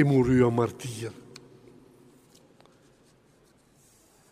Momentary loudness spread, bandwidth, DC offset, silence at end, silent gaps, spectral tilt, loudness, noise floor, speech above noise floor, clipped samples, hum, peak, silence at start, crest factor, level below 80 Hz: 28 LU; 14.5 kHz; under 0.1%; 3.2 s; none; -7.5 dB/octave; -25 LUFS; -61 dBFS; 38 dB; under 0.1%; none; -8 dBFS; 0 s; 20 dB; -54 dBFS